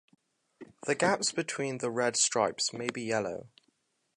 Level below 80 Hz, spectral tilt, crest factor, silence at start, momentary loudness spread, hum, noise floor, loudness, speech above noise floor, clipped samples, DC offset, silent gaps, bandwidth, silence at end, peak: -74 dBFS; -2.5 dB/octave; 22 dB; 0.6 s; 10 LU; none; -75 dBFS; -30 LUFS; 44 dB; under 0.1%; under 0.1%; none; 11.5 kHz; 0.7 s; -10 dBFS